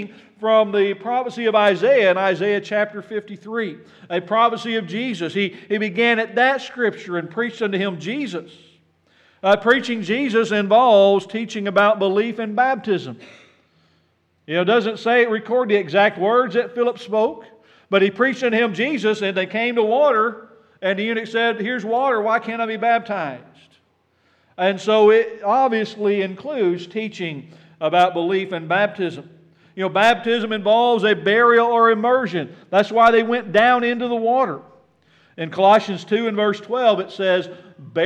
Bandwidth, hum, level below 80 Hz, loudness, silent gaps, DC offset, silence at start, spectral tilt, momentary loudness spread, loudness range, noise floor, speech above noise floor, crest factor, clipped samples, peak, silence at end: 9.4 kHz; none; -70 dBFS; -19 LUFS; none; under 0.1%; 0 s; -5.5 dB/octave; 12 LU; 5 LU; -63 dBFS; 45 dB; 16 dB; under 0.1%; -2 dBFS; 0 s